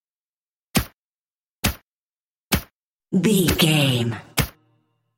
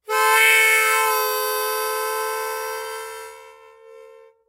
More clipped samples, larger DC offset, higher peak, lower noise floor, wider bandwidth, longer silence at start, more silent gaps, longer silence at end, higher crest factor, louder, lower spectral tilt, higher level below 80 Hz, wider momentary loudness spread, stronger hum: neither; neither; about the same, -4 dBFS vs -4 dBFS; first, under -90 dBFS vs -47 dBFS; about the same, 17 kHz vs 16 kHz; first, 0.75 s vs 0.1 s; first, 0.94-1.27 s, 1.35-1.63 s, 1.83-2.51 s, 2.73-2.99 s vs none; first, 0.7 s vs 0.4 s; about the same, 20 dB vs 18 dB; second, -21 LUFS vs -18 LUFS; first, -4.5 dB/octave vs 3 dB/octave; first, -40 dBFS vs -74 dBFS; second, 9 LU vs 19 LU; neither